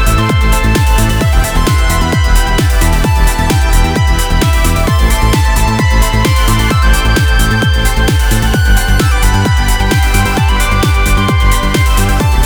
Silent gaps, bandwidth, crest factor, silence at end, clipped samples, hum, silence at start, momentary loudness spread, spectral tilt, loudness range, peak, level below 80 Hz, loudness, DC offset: none; over 20 kHz; 8 dB; 0 s; under 0.1%; none; 0 s; 1 LU; -4.5 dB/octave; 1 LU; 0 dBFS; -12 dBFS; -11 LUFS; under 0.1%